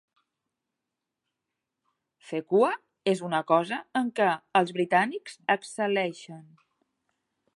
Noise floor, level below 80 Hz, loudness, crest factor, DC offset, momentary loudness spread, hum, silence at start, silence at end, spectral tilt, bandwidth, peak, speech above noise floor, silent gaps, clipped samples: -86 dBFS; -82 dBFS; -27 LUFS; 22 dB; under 0.1%; 10 LU; none; 2.25 s; 1.15 s; -5 dB/octave; 11.5 kHz; -8 dBFS; 59 dB; none; under 0.1%